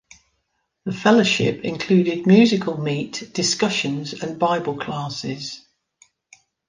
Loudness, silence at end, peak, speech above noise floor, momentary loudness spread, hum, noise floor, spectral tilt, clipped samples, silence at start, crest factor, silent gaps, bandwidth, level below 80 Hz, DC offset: -20 LUFS; 1.1 s; -4 dBFS; 53 dB; 14 LU; none; -73 dBFS; -5 dB/octave; under 0.1%; 0.85 s; 18 dB; none; 9.8 kHz; -60 dBFS; under 0.1%